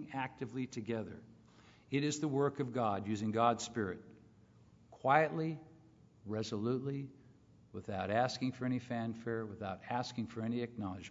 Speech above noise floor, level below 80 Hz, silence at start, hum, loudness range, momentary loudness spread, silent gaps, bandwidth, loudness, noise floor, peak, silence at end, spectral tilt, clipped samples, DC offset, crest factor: 27 dB; -76 dBFS; 0 s; none; 4 LU; 12 LU; none; 7.4 kHz; -37 LUFS; -63 dBFS; -14 dBFS; 0 s; -5.5 dB/octave; under 0.1%; under 0.1%; 26 dB